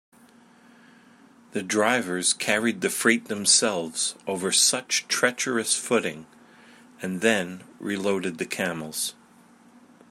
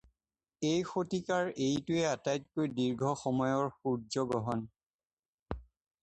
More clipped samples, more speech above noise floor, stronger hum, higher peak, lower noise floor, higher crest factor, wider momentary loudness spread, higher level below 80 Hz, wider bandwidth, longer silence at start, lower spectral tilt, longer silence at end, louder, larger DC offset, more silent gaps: neither; second, 29 dB vs over 57 dB; neither; first, -4 dBFS vs -18 dBFS; second, -54 dBFS vs under -90 dBFS; first, 22 dB vs 16 dB; first, 14 LU vs 10 LU; second, -74 dBFS vs -60 dBFS; first, 16 kHz vs 9.4 kHz; first, 1.55 s vs 0.6 s; second, -2 dB/octave vs -5.5 dB/octave; first, 1 s vs 0.4 s; first, -24 LUFS vs -34 LUFS; neither; second, none vs 4.83-4.99 s, 5.05-5.46 s